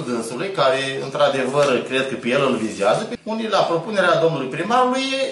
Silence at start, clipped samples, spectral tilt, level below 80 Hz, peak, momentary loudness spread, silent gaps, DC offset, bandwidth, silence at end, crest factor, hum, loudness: 0 s; under 0.1%; -4.5 dB/octave; -64 dBFS; -4 dBFS; 7 LU; none; under 0.1%; 12 kHz; 0 s; 16 dB; none; -20 LUFS